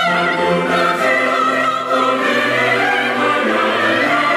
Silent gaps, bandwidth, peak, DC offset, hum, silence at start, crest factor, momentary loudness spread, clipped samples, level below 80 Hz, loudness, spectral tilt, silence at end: none; 16 kHz; -4 dBFS; under 0.1%; none; 0 s; 12 dB; 2 LU; under 0.1%; -62 dBFS; -15 LUFS; -4 dB/octave; 0 s